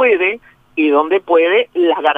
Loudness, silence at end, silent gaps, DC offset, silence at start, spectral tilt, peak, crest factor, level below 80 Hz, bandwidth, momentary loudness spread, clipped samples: -14 LUFS; 0 s; none; under 0.1%; 0 s; -5.5 dB/octave; 0 dBFS; 14 dB; -60 dBFS; 3.8 kHz; 8 LU; under 0.1%